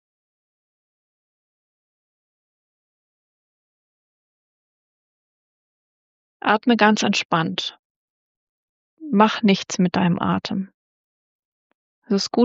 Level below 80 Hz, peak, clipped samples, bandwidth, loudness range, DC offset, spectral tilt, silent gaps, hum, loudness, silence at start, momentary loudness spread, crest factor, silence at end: -68 dBFS; -2 dBFS; under 0.1%; 7.6 kHz; 3 LU; under 0.1%; -4 dB/octave; 7.25-7.29 s, 7.79-8.97 s, 10.74-12.02 s; none; -20 LUFS; 6.45 s; 12 LU; 24 dB; 0 s